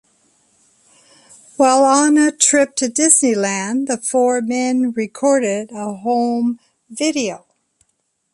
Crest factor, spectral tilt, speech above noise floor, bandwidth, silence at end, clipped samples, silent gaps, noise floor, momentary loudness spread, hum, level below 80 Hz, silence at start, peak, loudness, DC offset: 18 dB; -2.5 dB/octave; 53 dB; 11.5 kHz; 0.95 s; under 0.1%; none; -69 dBFS; 12 LU; none; -66 dBFS; 1.6 s; 0 dBFS; -16 LUFS; under 0.1%